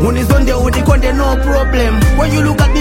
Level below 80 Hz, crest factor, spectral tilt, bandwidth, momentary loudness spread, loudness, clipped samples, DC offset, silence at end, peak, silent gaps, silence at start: -14 dBFS; 10 dB; -6 dB/octave; 16.5 kHz; 2 LU; -12 LUFS; under 0.1%; under 0.1%; 0 s; 0 dBFS; none; 0 s